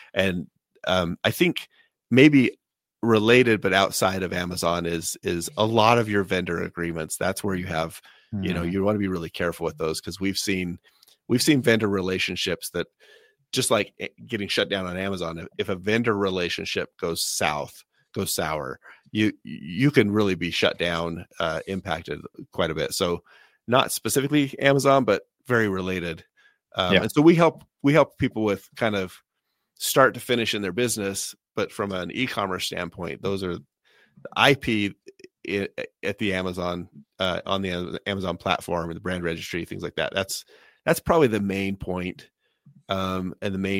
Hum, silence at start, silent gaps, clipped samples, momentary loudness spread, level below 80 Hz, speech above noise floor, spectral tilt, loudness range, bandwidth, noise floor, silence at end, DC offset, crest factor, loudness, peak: none; 0 s; none; under 0.1%; 13 LU; -54 dBFS; 54 dB; -4.5 dB/octave; 6 LU; 16 kHz; -79 dBFS; 0 s; under 0.1%; 24 dB; -24 LUFS; 0 dBFS